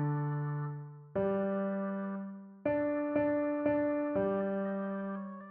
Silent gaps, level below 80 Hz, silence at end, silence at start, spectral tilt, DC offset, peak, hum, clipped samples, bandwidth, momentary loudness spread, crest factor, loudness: none; -68 dBFS; 0 s; 0 s; -9 dB/octave; under 0.1%; -18 dBFS; none; under 0.1%; 3.8 kHz; 9 LU; 14 dB; -34 LUFS